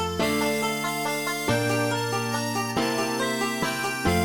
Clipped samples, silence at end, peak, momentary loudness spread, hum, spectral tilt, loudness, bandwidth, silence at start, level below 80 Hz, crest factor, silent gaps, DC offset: under 0.1%; 0 s; -10 dBFS; 3 LU; none; -4 dB/octave; -25 LUFS; 17.5 kHz; 0 s; -48 dBFS; 14 dB; none; under 0.1%